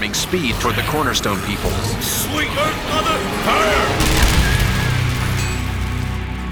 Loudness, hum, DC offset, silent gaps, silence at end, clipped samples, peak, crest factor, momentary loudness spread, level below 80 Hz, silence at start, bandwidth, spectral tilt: -18 LUFS; none; under 0.1%; none; 0 s; under 0.1%; -2 dBFS; 16 dB; 7 LU; -26 dBFS; 0 s; over 20 kHz; -4 dB/octave